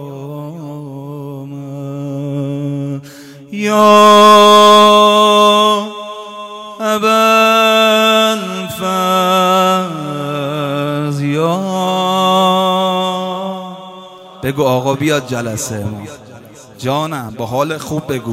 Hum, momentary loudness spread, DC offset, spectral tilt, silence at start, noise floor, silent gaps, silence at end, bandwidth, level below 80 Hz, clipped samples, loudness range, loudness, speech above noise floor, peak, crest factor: none; 21 LU; under 0.1%; -4.5 dB/octave; 0 s; -36 dBFS; none; 0 s; over 20 kHz; -56 dBFS; 0.9%; 11 LU; -12 LUFS; 23 dB; 0 dBFS; 14 dB